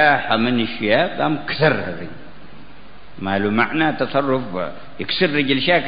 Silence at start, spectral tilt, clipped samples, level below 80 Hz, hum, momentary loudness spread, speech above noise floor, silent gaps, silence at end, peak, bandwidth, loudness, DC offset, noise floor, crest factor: 0 s; -10.5 dB/octave; under 0.1%; -52 dBFS; none; 12 LU; 25 dB; none; 0 s; -2 dBFS; 5.2 kHz; -19 LUFS; 3%; -44 dBFS; 18 dB